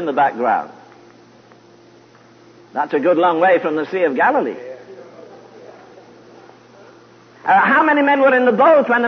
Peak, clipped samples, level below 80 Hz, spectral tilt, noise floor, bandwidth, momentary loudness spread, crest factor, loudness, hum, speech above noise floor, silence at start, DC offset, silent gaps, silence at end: -2 dBFS; under 0.1%; -74 dBFS; -6.5 dB/octave; -47 dBFS; 6.4 kHz; 15 LU; 16 dB; -15 LUFS; none; 32 dB; 0 s; under 0.1%; none; 0 s